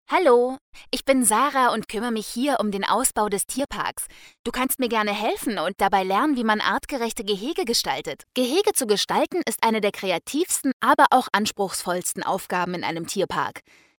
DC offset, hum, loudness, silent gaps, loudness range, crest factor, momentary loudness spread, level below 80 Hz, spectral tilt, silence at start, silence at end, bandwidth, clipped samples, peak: under 0.1%; none; -23 LUFS; 0.61-0.73 s, 4.39-4.44 s, 10.73-10.80 s; 3 LU; 20 dB; 9 LU; -54 dBFS; -2.5 dB/octave; 0.1 s; 0.4 s; 19.5 kHz; under 0.1%; -2 dBFS